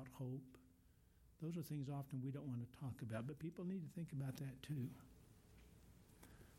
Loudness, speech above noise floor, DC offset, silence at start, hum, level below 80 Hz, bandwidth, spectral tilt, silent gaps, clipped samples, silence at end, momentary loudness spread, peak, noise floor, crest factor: -50 LUFS; 23 dB; under 0.1%; 0 s; none; -74 dBFS; 16.5 kHz; -7.5 dB/octave; none; under 0.1%; 0 s; 19 LU; -32 dBFS; -72 dBFS; 18 dB